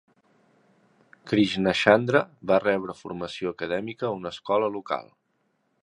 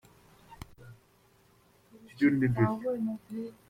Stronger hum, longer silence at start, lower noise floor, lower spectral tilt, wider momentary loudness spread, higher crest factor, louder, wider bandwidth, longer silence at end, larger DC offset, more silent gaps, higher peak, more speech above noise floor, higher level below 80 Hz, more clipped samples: neither; first, 1.25 s vs 0.5 s; first, -72 dBFS vs -64 dBFS; second, -6 dB/octave vs -9 dB/octave; second, 13 LU vs 24 LU; first, 26 dB vs 20 dB; first, -25 LUFS vs -30 LUFS; second, 11 kHz vs 15 kHz; first, 0.8 s vs 0.2 s; neither; neither; first, -2 dBFS vs -14 dBFS; first, 47 dB vs 35 dB; about the same, -62 dBFS vs -60 dBFS; neither